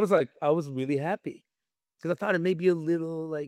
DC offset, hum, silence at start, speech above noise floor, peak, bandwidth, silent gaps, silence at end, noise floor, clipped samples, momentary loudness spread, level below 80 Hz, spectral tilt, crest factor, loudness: under 0.1%; none; 0 s; over 63 dB; -8 dBFS; 13 kHz; none; 0 s; under -90 dBFS; under 0.1%; 9 LU; -80 dBFS; -7.5 dB/octave; 20 dB; -28 LUFS